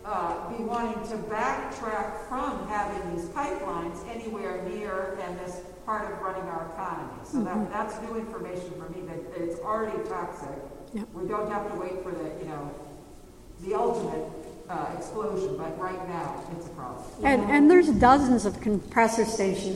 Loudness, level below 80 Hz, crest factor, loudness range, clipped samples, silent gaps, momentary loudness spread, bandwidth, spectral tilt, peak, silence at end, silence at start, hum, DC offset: -28 LUFS; -50 dBFS; 22 dB; 11 LU; under 0.1%; none; 16 LU; 15.5 kHz; -5.5 dB/octave; -6 dBFS; 0 s; 0 s; none; under 0.1%